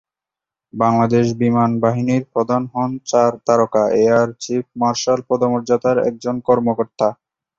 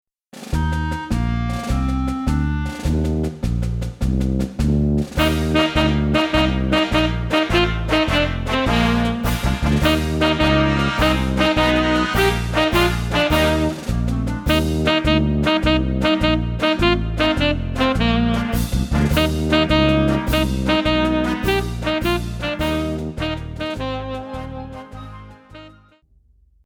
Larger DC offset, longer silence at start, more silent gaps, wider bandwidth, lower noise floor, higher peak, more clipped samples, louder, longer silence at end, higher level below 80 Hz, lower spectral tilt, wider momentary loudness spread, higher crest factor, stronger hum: neither; first, 0.75 s vs 0.35 s; neither; second, 7.6 kHz vs 19 kHz; first, -87 dBFS vs -55 dBFS; about the same, -2 dBFS vs -2 dBFS; neither; about the same, -17 LUFS vs -19 LUFS; second, 0.45 s vs 0.95 s; second, -56 dBFS vs -26 dBFS; about the same, -6.5 dB/octave vs -6 dB/octave; about the same, 6 LU vs 8 LU; about the same, 16 dB vs 16 dB; neither